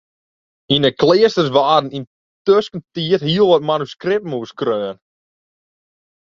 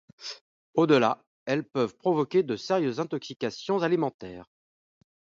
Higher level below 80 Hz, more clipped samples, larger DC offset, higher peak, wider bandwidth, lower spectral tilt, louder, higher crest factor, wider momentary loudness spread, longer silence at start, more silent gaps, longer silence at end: first, -56 dBFS vs -70 dBFS; neither; neither; first, 0 dBFS vs -8 dBFS; about the same, 7.4 kHz vs 7.6 kHz; about the same, -6 dB/octave vs -6 dB/octave; first, -16 LUFS vs -27 LUFS; about the same, 18 dB vs 20 dB; second, 12 LU vs 17 LU; first, 0.7 s vs 0.2 s; second, 2.07-2.45 s vs 0.41-0.73 s, 1.27-1.46 s, 4.14-4.19 s; first, 1.4 s vs 0.95 s